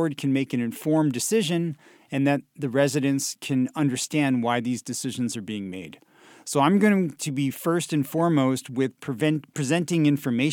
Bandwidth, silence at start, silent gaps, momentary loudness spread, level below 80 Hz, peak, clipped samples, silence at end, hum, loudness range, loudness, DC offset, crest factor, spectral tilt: 18 kHz; 0 s; none; 9 LU; -72 dBFS; -6 dBFS; under 0.1%; 0 s; none; 2 LU; -24 LUFS; under 0.1%; 18 dB; -5.5 dB/octave